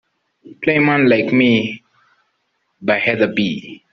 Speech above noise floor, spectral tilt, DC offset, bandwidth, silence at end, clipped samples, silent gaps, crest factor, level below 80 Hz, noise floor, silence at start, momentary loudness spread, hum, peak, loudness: 52 dB; -4 dB/octave; under 0.1%; 6.2 kHz; 0.15 s; under 0.1%; none; 16 dB; -58 dBFS; -68 dBFS; 0.45 s; 13 LU; none; -2 dBFS; -16 LUFS